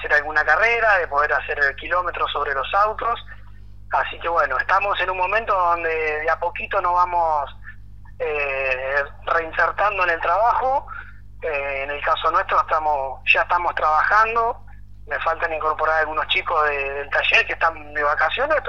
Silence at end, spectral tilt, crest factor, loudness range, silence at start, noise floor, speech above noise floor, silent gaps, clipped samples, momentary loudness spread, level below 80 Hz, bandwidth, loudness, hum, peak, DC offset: 0 s; -4 dB/octave; 20 dB; 3 LU; 0 s; -42 dBFS; 21 dB; none; under 0.1%; 9 LU; -44 dBFS; 7.4 kHz; -20 LUFS; 50 Hz at -45 dBFS; -2 dBFS; 0.9%